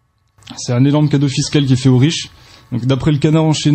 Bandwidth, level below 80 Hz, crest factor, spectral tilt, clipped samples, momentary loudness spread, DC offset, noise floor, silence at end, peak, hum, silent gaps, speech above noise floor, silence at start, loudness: 8.8 kHz; -42 dBFS; 12 dB; -6 dB/octave; under 0.1%; 13 LU; under 0.1%; -44 dBFS; 0 s; -2 dBFS; none; none; 31 dB; 0.5 s; -14 LUFS